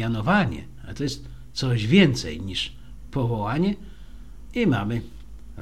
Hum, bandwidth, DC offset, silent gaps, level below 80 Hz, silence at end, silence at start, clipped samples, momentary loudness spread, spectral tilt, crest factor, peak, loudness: none; 12.5 kHz; 0.8%; none; -42 dBFS; 0 s; 0 s; under 0.1%; 18 LU; -6 dB/octave; 20 dB; -4 dBFS; -24 LUFS